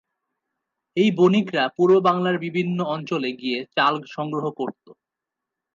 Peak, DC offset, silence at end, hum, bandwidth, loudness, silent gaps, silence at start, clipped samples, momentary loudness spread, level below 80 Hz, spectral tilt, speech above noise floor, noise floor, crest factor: -4 dBFS; under 0.1%; 1.05 s; none; 7.4 kHz; -22 LUFS; none; 0.95 s; under 0.1%; 11 LU; -72 dBFS; -7 dB/octave; 64 dB; -86 dBFS; 18 dB